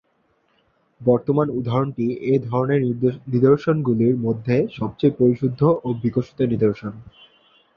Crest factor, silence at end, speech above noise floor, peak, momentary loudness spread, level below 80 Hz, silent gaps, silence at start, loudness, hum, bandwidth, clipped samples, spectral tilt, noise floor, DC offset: 18 dB; 0.7 s; 45 dB; -4 dBFS; 6 LU; -54 dBFS; none; 1 s; -20 LUFS; none; 6.6 kHz; under 0.1%; -10.5 dB/octave; -65 dBFS; under 0.1%